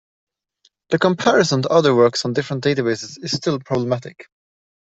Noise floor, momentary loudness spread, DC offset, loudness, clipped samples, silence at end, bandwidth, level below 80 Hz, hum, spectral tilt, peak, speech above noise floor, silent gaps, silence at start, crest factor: -62 dBFS; 9 LU; under 0.1%; -18 LUFS; under 0.1%; 0.6 s; 8.2 kHz; -60 dBFS; none; -5 dB/octave; -2 dBFS; 44 dB; none; 0.9 s; 18 dB